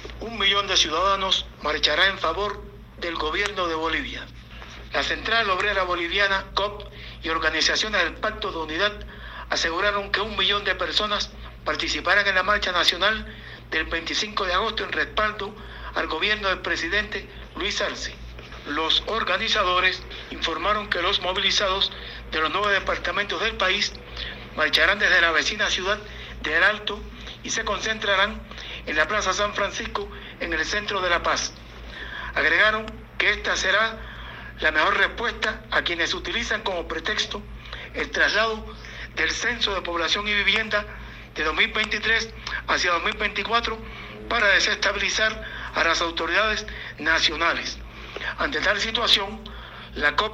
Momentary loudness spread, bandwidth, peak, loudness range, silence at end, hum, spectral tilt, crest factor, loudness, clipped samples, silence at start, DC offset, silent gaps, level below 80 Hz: 16 LU; 16 kHz; -6 dBFS; 4 LU; 0 s; none; -2 dB/octave; 20 dB; -23 LUFS; under 0.1%; 0 s; under 0.1%; none; -42 dBFS